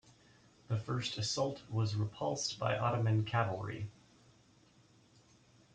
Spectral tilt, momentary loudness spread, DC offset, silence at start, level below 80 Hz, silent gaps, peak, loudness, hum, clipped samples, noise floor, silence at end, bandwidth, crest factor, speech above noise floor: -5 dB/octave; 8 LU; under 0.1%; 0.7 s; -68 dBFS; none; -20 dBFS; -36 LUFS; none; under 0.1%; -66 dBFS; 1.85 s; 9.2 kHz; 18 dB; 31 dB